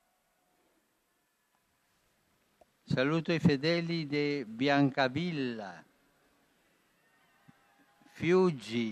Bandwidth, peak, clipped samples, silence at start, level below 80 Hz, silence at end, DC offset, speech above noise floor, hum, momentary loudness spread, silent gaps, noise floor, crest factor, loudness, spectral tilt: 11 kHz; -12 dBFS; under 0.1%; 2.9 s; -70 dBFS; 0 s; under 0.1%; 46 dB; none; 9 LU; none; -76 dBFS; 20 dB; -30 LUFS; -7 dB/octave